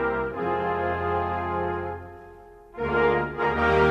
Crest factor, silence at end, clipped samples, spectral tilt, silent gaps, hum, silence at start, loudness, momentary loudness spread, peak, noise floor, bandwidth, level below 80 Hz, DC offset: 16 dB; 0 s; under 0.1%; -7.5 dB/octave; none; none; 0 s; -26 LUFS; 15 LU; -8 dBFS; -47 dBFS; 8 kHz; -44 dBFS; under 0.1%